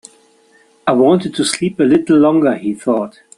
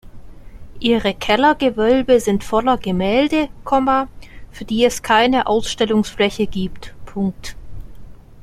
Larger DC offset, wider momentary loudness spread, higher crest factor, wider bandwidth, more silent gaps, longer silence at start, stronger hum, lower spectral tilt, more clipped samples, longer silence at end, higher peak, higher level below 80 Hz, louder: neither; second, 8 LU vs 12 LU; about the same, 14 dB vs 16 dB; second, 12 kHz vs 15 kHz; neither; first, 0.85 s vs 0.05 s; neither; about the same, -5.5 dB/octave vs -5 dB/octave; neither; first, 0.3 s vs 0 s; about the same, 0 dBFS vs -2 dBFS; second, -56 dBFS vs -38 dBFS; first, -14 LUFS vs -17 LUFS